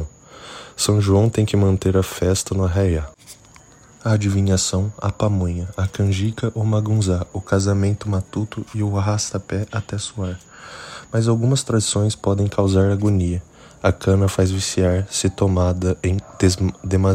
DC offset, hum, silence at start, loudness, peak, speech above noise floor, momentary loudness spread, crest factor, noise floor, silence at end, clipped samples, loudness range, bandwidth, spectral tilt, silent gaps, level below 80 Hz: under 0.1%; none; 0 s; -20 LUFS; -2 dBFS; 28 dB; 10 LU; 18 dB; -47 dBFS; 0 s; under 0.1%; 3 LU; 15.5 kHz; -6 dB/octave; none; -40 dBFS